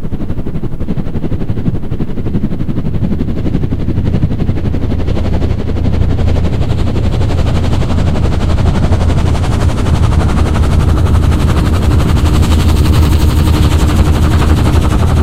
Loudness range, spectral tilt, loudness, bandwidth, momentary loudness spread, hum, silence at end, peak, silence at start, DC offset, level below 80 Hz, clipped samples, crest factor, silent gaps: 6 LU; -7 dB/octave; -13 LUFS; 15 kHz; 8 LU; none; 0 s; 0 dBFS; 0 s; under 0.1%; -14 dBFS; under 0.1%; 10 dB; none